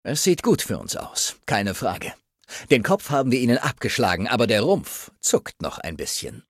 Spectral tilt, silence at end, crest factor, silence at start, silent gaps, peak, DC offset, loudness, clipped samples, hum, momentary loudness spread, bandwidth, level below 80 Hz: -4 dB/octave; 0.1 s; 20 dB; 0.05 s; none; -2 dBFS; under 0.1%; -22 LUFS; under 0.1%; none; 12 LU; 16 kHz; -52 dBFS